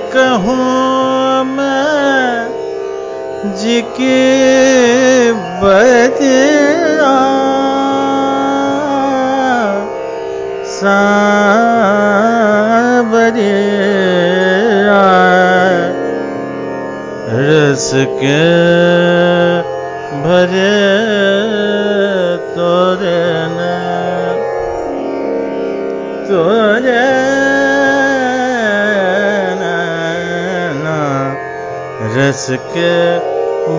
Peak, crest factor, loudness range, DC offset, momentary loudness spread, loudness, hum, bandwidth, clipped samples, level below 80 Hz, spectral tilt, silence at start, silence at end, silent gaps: 0 dBFS; 12 dB; 5 LU; under 0.1%; 11 LU; -12 LUFS; none; 7.6 kHz; under 0.1%; -48 dBFS; -5 dB/octave; 0 s; 0 s; none